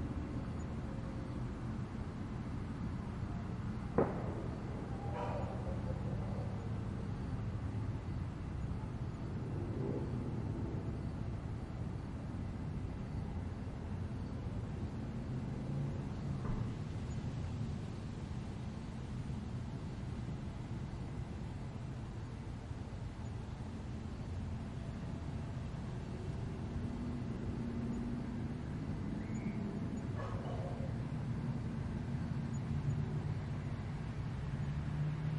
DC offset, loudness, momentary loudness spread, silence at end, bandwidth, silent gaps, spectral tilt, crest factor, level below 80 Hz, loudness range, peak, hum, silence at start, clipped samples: under 0.1%; -42 LUFS; 5 LU; 0 s; 11 kHz; none; -8 dB/octave; 24 dB; -50 dBFS; 4 LU; -18 dBFS; none; 0 s; under 0.1%